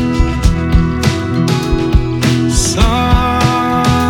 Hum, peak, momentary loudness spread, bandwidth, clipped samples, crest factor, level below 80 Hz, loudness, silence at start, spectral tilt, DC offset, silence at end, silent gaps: none; 0 dBFS; 3 LU; 17.5 kHz; under 0.1%; 12 dB; -18 dBFS; -13 LUFS; 0 s; -5.5 dB/octave; under 0.1%; 0 s; none